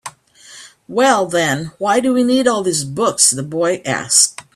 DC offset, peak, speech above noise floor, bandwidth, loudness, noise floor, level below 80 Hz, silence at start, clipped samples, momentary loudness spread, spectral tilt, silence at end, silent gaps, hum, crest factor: under 0.1%; 0 dBFS; 27 dB; 16 kHz; -15 LUFS; -42 dBFS; -58 dBFS; 0.05 s; under 0.1%; 8 LU; -2.5 dB/octave; 0.15 s; none; none; 16 dB